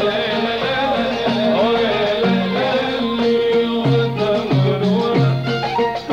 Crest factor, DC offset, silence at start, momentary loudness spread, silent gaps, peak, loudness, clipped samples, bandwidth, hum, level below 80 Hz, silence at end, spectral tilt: 12 dB; 0.1%; 0 s; 3 LU; none; -6 dBFS; -17 LUFS; under 0.1%; 8.6 kHz; none; -48 dBFS; 0 s; -7 dB/octave